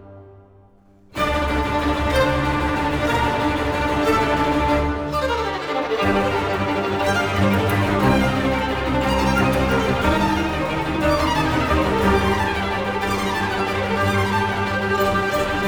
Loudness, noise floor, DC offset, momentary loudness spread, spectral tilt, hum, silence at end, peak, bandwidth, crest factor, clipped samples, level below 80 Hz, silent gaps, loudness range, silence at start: -20 LUFS; -51 dBFS; under 0.1%; 4 LU; -5.5 dB/octave; none; 0 s; -4 dBFS; over 20 kHz; 14 dB; under 0.1%; -32 dBFS; none; 2 LU; 0 s